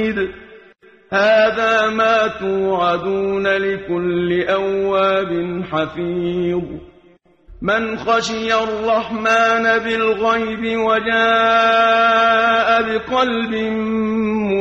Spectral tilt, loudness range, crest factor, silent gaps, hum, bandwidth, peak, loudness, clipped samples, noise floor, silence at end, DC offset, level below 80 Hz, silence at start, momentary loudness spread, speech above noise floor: -5 dB/octave; 6 LU; 14 dB; none; none; 8.2 kHz; -2 dBFS; -17 LUFS; under 0.1%; -51 dBFS; 0 s; under 0.1%; -48 dBFS; 0 s; 9 LU; 35 dB